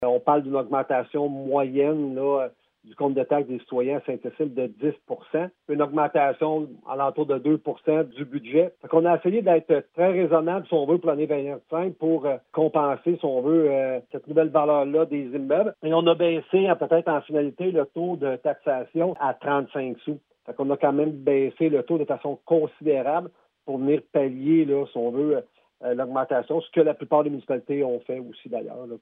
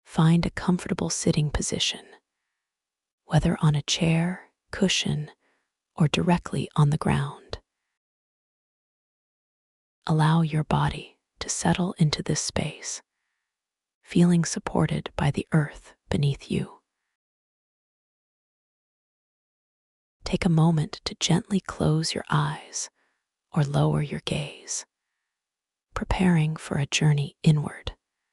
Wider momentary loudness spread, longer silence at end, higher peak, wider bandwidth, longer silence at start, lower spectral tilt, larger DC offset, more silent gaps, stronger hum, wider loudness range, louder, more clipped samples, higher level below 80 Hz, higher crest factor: second, 9 LU vs 13 LU; second, 0.05 s vs 0.4 s; about the same, -6 dBFS vs -6 dBFS; second, 3.9 kHz vs 12 kHz; about the same, 0 s vs 0.1 s; first, -10.5 dB/octave vs -5 dB/octave; neither; second, none vs 3.12-3.18 s, 7.97-10.02 s, 13.95-14.01 s, 17.15-20.20 s; neither; about the same, 4 LU vs 5 LU; about the same, -24 LUFS vs -25 LUFS; neither; second, -80 dBFS vs -46 dBFS; about the same, 18 dB vs 20 dB